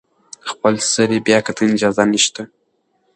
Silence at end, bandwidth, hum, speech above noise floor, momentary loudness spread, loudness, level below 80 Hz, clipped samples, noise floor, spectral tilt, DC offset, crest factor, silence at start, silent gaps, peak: 0.7 s; 10 kHz; none; 49 dB; 16 LU; -16 LUFS; -58 dBFS; under 0.1%; -65 dBFS; -3 dB/octave; under 0.1%; 18 dB; 0.45 s; none; 0 dBFS